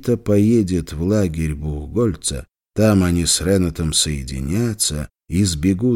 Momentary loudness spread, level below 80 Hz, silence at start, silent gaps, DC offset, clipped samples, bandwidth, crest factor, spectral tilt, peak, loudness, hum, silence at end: 9 LU; -34 dBFS; 0 s; none; under 0.1%; under 0.1%; 17 kHz; 16 dB; -5 dB/octave; -2 dBFS; -19 LUFS; none; 0 s